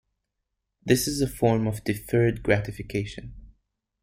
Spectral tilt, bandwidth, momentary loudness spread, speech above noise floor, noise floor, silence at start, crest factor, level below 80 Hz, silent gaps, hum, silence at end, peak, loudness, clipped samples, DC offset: -5.5 dB/octave; 16.5 kHz; 14 LU; 57 dB; -81 dBFS; 0.85 s; 20 dB; -46 dBFS; none; none; 0.55 s; -6 dBFS; -25 LUFS; under 0.1%; under 0.1%